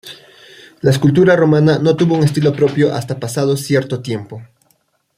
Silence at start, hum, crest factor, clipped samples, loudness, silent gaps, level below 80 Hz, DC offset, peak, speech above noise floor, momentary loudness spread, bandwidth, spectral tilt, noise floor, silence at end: 0.05 s; none; 14 dB; under 0.1%; -14 LUFS; none; -52 dBFS; under 0.1%; -2 dBFS; 47 dB; 14 LU; 15.5 kHz; -7 dB/octave; -61 dBFS; 0.75 s